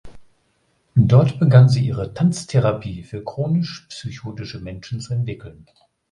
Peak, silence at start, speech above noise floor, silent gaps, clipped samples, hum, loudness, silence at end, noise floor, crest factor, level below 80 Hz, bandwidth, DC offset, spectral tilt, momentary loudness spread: 0 dBFS; 0.05 s; 46 dB; none; under 0.1%; none; -18 LUFS; 0.6 s; -65 dBFS; 18 dB; -46 dBFS; 10.5 kHz; under 0.1%; -7.5 dB/octave; 18 LU